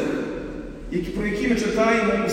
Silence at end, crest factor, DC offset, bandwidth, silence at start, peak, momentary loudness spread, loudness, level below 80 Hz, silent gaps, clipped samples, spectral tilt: 0 s; 16 dB; under 0.1%; 15 kHz; 0 s; -8 dBFS; 13 LU; -23 LUFS; -40 dBFS; none; under 0.1%; -5.5 dB/octave